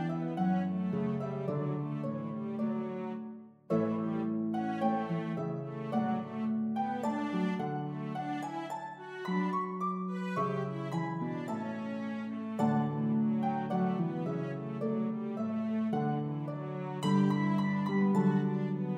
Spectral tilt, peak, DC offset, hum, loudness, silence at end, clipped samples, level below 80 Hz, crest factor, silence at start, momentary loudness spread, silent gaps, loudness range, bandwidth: -8.5 dB/octave; -16 dBFS; under 0.1%; none; -34 LUFS; 0 s; under 0.1%; -80 dBFS; 16 dB; 0 s; 8 LU; none; 3 LU; 9.6 kHz